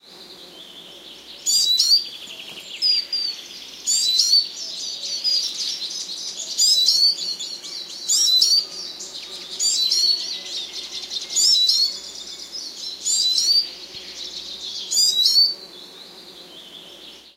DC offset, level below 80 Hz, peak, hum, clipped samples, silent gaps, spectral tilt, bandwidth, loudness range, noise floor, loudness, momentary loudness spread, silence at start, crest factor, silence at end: under 0.1%; -68 dBFS; -4 dBFS; none; under 0.1%; none; 2.5 dB/octave; 16 kHz; 3 LU; -43 dBFS; -18 LUFS; 24 LU; 0.05 s; 20 dB; 0.05 s